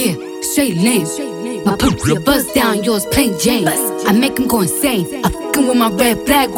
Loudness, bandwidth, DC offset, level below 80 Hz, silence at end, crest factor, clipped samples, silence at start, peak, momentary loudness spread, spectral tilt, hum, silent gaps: -15 LUFS; 19 kHz; under 0.1%; -36 dBFS; 0 s; 14 dB; under 0.1%; 0 s; 0 dBFS; 6 LU; -4 dB/octave; none; none